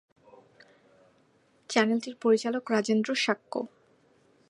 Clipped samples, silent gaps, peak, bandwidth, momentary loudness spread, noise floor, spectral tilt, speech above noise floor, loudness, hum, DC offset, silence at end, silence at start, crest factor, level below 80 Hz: under 0.1%; none; -8 dBFS; 11 kHz; 10 LU; -65 dBFS; -4 dB/octave; 38 dB; -28 LUFS; none; under 0.1%; 0.85 s; 1.7 s; 22 dB; -84 dBFS